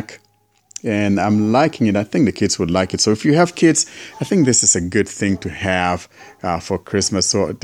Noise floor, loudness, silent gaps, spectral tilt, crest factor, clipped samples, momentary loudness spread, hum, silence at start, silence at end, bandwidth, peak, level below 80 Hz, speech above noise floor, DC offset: -60 dBFS; -17 LUFS; none; -4 dB/octave; 16 dB; under 0.1%; 10 LU; none; 0 s; 0.05 s; 14 kHz; 0 dBFS; -48 dBFS; 43 dB; under 0.1%